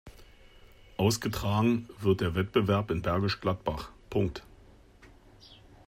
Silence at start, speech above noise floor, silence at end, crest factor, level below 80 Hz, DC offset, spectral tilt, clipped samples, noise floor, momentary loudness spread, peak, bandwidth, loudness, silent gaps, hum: 0.05 s; 27 dB; 0.35 s; 20 dB; -50 dBFS; under 0.1%; -6 dB/octave; under 0.1%; -56 dBFS; 8 LU; -12 dBFS; 16 kHz; -29 LUFS; none; none